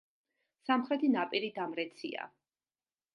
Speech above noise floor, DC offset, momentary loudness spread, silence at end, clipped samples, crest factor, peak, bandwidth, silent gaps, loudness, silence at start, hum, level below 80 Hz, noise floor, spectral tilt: over 57 dB; under 0.1%; 14 LU; 0.9 s; under 0.1%; 20 dB; -16 dBFS; 10.5 kHz; none; -34 LUFS; 0.65 s; none; -88 dBFS; under -90 dBFS; -6 dB/octave